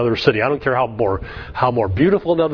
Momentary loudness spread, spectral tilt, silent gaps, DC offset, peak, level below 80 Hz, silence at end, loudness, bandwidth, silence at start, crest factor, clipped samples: 5 LU; -8 dB/octave; none; under 0.1%; 0 dBFS; -40 dBFS; 0 s; -18 LUFS; 5.4 kHz; 0 s; 18 dB; under 0.1%